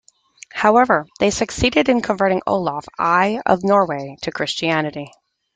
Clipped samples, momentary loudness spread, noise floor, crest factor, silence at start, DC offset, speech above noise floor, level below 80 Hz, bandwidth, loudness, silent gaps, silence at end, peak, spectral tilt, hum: under 0.1%; 11 LU; -46 dBFS; 18 dB; 0.55 s; under 0.1%; 28 dB; -44 dBFS; 9.4 kHz; -18 LUFS; none; 0.45 s; -2 dBFS; -4.5 dB/octave; none